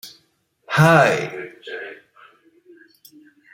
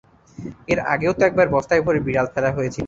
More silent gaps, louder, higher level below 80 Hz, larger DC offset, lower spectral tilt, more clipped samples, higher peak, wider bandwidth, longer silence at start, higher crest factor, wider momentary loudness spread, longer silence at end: neither; first, -16 LUFS vs -19 LUFS; second, -62 dBFS vs -46 dBFS; neither; about the same, -6 dB/octave vs -6.5 dB/octave; neither; first, 0 dBFS vs -4 dBFS; first, 16 kHz vs 7.8 kHz; second, 0.05 s vs 0.4 s; about the same, 22 dB vs 18 dB; first, 22 LU vs 14 LU; first, 1.6 s vs 0 s